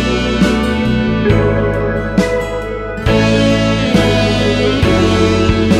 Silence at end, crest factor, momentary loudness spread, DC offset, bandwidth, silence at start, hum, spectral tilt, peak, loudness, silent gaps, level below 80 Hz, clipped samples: 0 s; 12 dB; 5 LU; under 0.1%; 13.5 kHz; 0 s; none; -6 dB/octave; 0 dBFS; -13 LUFS; none; -24 dBFS; under 0.1%